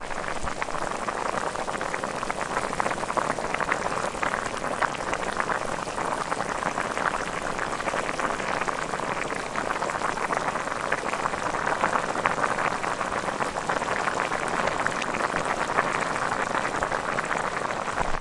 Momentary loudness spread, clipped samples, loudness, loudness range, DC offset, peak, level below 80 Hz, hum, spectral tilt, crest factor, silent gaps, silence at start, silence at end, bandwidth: 4 LU; under 0.1%; -27 LUFS; 2 LU; under 0.1%; -2 dBFS; -46 dBFS; none; -3.5 dB/octave; 26 dB; none; 0 s; 0 s; 11.5 kHz